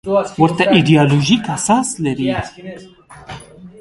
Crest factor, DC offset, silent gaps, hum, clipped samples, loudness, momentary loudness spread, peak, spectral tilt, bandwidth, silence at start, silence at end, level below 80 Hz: 16 dB; under 0.1%; none; none; under 0.1%; -14 LUFS; 22 LU; 0 dBFS; -5 dB/octave; 11.5 kHz; 0.05 s; 0.1 s; -46 dBFS